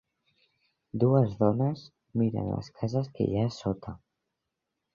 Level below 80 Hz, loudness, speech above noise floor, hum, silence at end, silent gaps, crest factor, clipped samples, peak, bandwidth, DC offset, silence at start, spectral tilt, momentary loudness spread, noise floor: -56 dBFS; -29 LUFS; 57 dB; none; 1 s; none; 20 dB; under 0.1%; -10 dBFS; 7.2 kHz; under 0.1%; 0.95 s; -9 dB/octave; 15 LU; -84 dBFS